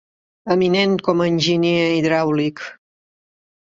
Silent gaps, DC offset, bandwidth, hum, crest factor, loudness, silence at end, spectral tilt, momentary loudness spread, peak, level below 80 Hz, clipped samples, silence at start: none; under 0.1%; 7.8 kHz; none; 16 dB; -18 LUFS; 1.05 s; -6 dB/octave; 13 LU; -4 dBFS; -58 dBFS; under 0.1%; 0.45 s